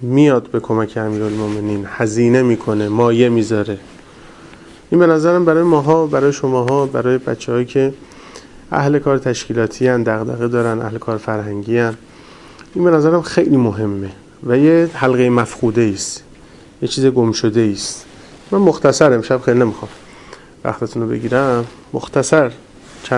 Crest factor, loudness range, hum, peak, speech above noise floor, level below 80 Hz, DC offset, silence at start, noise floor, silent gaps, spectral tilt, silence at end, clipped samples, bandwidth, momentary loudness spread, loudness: 16 dB; 4 LU; none; 0 dBFS; 26 dB; -50 dBFS; under 0.1%; 0 s; -41 dBFS; none; -6 dB/octave; 0 s; under 0.1%; 11.5 kHz; 11 LU; -15 LUFS